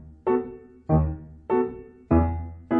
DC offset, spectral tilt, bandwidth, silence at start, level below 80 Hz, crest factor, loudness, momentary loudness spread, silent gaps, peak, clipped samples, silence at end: under 0.1%; -12.5 dB/octave; 3.6 kHz; 0 s; -34 dBFS; 16 dB; -25 LUFS; 16 LU; none; -8 dBFS; under 0.1%; 0 s